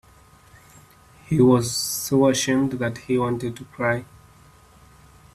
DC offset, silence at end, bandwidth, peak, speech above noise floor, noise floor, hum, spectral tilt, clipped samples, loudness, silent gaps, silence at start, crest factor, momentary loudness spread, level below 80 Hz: under 0.1%; 1.3 s; 15 kHz; -4 dBFS; 31 dB; -52 dBFS; none; -5 dB/octave; under 0.1%; -22 LUFS; none; 1.3 s; 20 dB; 11 LU; -54 dBFS